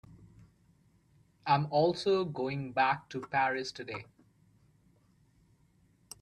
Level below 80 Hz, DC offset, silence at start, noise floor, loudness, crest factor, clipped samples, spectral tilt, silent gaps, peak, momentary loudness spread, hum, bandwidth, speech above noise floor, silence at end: -70 dBFS; under 0.1%; 0.1 s; -67 dBFS; -32 LUFS; 22 dB; under 0.1%; -5.5 dB/octave; none; -14 dBFS; 14 LU; none; 13 kHz; 36 dB; 2.2 s